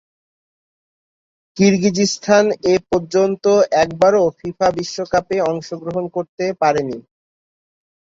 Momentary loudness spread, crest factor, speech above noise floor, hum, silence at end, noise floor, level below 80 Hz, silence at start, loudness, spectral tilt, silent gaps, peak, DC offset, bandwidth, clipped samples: 10 LU; 16 dB; over 74 dB; none; 1 s; under -90 dBFS; -54 dBFS; 1.55 s; -17 LUFS; -5 dB/octave; 6.29-6.38 s; -2 dBFS; under 0.1%; 7.8 kHz; under 0.1%